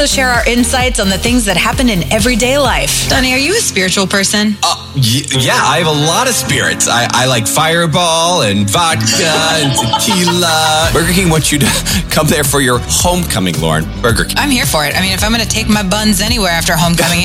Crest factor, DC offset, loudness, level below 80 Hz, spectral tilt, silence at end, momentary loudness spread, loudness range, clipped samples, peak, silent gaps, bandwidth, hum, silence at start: 12 dB; under 0.1%; -11 LUFS; -26 dBFS; -3 dB/octave; 0 s; 2 LU; 1 LU; under 0.1%; 0 dBFS; none; 16.5 kHz; none; 0 s